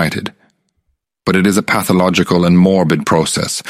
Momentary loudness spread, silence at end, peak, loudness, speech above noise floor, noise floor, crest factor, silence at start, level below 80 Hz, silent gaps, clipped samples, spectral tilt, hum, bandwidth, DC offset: 10 LU; 0 s; 0 dBFS; -13 LUFS; 54 dB; -67 dBFS; 14 dB; 0 s; -46 dBFS; none; under 0.1%; -5 dB/octave; none; 16 kHz; under 0.1%